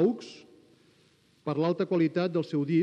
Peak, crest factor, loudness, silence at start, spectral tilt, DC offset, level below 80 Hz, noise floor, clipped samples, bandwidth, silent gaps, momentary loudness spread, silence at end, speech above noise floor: -14 dBFS; 14 dB; -29 LUFS; 0 s; -8 dB/octave; under 0.1%; -82 dBFS; -64 dBFS; under 0.1%; 8.6 kHz; none; 15 LU; 0 s; 36 dB